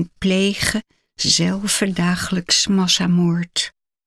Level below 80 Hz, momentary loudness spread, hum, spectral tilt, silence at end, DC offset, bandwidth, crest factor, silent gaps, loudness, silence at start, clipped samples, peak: -46 dBFS; 7 LU; none; -3.5 dB/octave; 0.35 s; under 0.1%; 14 kHz; 18 dB; none; -18 LUFS; 0 s; under 0.1%; -2 dBFS